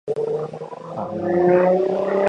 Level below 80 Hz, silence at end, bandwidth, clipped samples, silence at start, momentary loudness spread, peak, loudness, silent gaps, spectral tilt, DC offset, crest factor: -60 dBFS; 0 s; 7.4 kHz; under 0.1%; 0.05 s; 15 LU; -4 dBFS; -20 LUFS; none; -8.5 dB/octave; under 0.1%; 16 dB